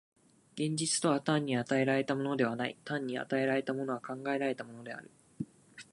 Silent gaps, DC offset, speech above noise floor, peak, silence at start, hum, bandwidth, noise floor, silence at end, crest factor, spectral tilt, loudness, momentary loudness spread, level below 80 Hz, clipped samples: none; under 0.1%; 21 dB; -16 dBFS; 0.55 s; none; 11.5 kHz; -54 dBFS; 0.1 s; 18 dB; -4.5 dB/octave; -33 LUFS; 15 LU; -78 dBFS; under 0.1%